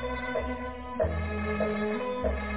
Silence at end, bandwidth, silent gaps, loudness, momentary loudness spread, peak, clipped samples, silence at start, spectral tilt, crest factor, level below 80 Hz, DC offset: 0 s; 4 kHz; none; -31 LUFS; 5 LU; -16 dBFS; under 0.1%; 0 s; -5.5 dB/octave; 16 dB; -38 dBFS; 0.3%